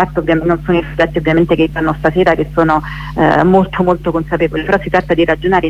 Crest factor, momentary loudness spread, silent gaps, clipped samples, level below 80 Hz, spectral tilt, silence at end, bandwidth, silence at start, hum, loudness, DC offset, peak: 12 dB; 5 LU; none; under 0.1%; -30 dBFS; -8 dB/octave; 0 s; 8 kHz; 0 s; none; -13 LUFS; under 0.1%; 0 dBFS